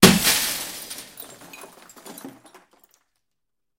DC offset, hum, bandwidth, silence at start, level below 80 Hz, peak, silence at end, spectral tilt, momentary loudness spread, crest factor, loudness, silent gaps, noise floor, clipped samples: under 0.1%; none; 17 kHz; 0 s; -50 dBFS; 0 dBFS; 1.5 s; -3 dB/octave; 25 LU; 24 dB; -20 LUFS; none; -85 dBFS; under 0.1%